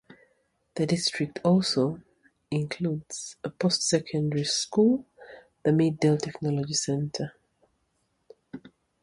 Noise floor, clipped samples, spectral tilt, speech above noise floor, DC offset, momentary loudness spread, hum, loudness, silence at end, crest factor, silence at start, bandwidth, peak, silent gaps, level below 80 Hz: -74 dBFS; under 0.1%; -5 dB/octave; 48 dB; under 0.1%; 14 LU; none; -27 LUFS; 0.35 s; 18 dB; 0.75 s; 11.5 kHz; -10 dBFS; none; -64 dBFS